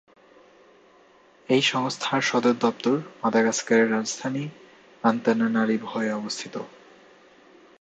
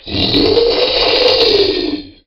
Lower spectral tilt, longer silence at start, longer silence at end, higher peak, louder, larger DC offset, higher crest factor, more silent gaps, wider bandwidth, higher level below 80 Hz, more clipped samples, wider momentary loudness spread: about the same, -4 dB/octave vs -5 dB/octave; first, 1.5 s vs 0.05 s; first, 1.15 s vs 0.15 s; second, -4 dBFS vs 0 dBFS; second, -24 LUFS vs -11 LUFS; neither; first, 22 dB vs 12 dB; neither; second, 9 kHz vs 13.5 kHz; second, -72 dBFS vs -34 dBFS; neither; first, 11 LU vs 6 LU